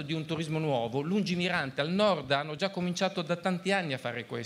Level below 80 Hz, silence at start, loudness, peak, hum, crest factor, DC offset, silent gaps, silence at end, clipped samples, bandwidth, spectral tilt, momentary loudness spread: -68 dBFS; 0 s; -30 LUFS; -12 dBFS; none; 20 dB; under 0.1%; none; 0 s; under 0.1%; 12.5 kHz; -5.5 dB/octave; 6 LU